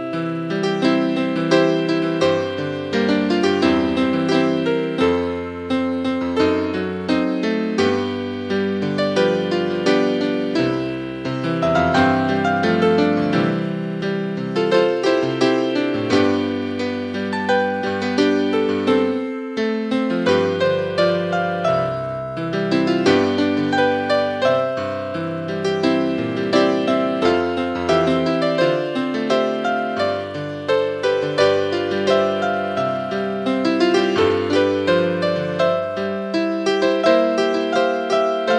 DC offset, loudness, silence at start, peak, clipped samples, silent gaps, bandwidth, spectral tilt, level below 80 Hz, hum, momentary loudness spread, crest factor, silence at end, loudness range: under 0.1%; -19 LUFS; 0 s; -2 dBFS; under 0.1%; none; 10.5 kHz; -6 dB/octave; -58 dBFS; none; 7 LU; 16 dB; 0 s; 2 LU